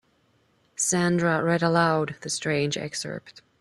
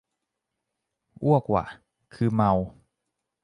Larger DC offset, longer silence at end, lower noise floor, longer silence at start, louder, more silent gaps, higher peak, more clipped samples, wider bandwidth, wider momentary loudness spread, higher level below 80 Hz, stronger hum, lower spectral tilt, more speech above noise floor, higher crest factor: neither; second, 0.2 s vs 0.75 s; second, -66 dBFS vs -83 dBFS; second, 0.8 s vs 1.2 s; about the same, -24 LUFS vs -25 LUFS; neither; about the same, -6 dBFS vs -8 dBFS; neither; first, 13 kHz vs 10.5 kHz; about the same, 12 LU vs 12 LU; second, -64 dBFS vs -52 dBFS; neither; second, -4 dB/octave vs -10 dB/octave; second, 41 dB vs 60 dB; about the same, 20 dB vs 20 dB